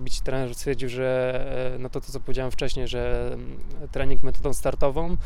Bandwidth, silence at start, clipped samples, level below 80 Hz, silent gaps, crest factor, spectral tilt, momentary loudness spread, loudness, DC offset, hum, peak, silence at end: 13 kHz; 0 s; under 0.1%; -30 dBFS; none; 14 dB; -5.5 dB/octave; 9 LU; -29 LUFS; under 0.1%; none; -6 dBFS; 0 s